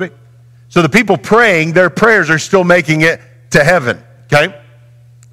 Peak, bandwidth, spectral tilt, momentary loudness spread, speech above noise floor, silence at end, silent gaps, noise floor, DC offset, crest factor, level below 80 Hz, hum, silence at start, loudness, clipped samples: 0 dBFS; 16 kHz; -5 dB/octave; 9 LU; 31 dB; 0.75 s; none; -41 dBFS; 0.5%; 12 dB; -44 dBFS; none; 0 s; -10 LUFS; 0.1%